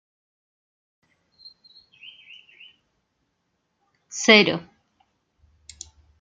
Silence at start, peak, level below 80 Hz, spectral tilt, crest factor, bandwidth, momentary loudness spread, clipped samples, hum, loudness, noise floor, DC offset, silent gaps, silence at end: 4.15 s; -2 dBFS; -68 dBFS; -3 dB/octave; 26 dB; 9.6 kHz; 29 LU; under 0.1%; none; -17 LUFS; -75 dBFS; under 0.1%; none; 1.6 s